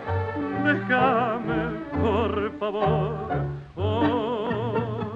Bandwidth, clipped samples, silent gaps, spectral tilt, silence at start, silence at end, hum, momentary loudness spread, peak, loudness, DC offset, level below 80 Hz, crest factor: 7.4 kHz; under 0.1%; none; -8.5 dB/octave; 0 s; 0 s; none; 7 LU; -8 dBFS; -25 LUFS; under 0.1%; -48 dBFS; 16 dB